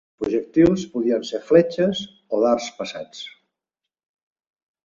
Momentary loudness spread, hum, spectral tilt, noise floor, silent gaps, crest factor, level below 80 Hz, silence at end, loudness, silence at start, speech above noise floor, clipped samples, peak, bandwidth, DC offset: 16 LU; none; -6 dB/octave; -86 dBFS; none; 20 dB; -54 dBFS; 1.55 s; -21 LUFS; 0.2 s; 65 dB; under 0.1%; -2 dBFS; 7.4 kHz; under 0.1%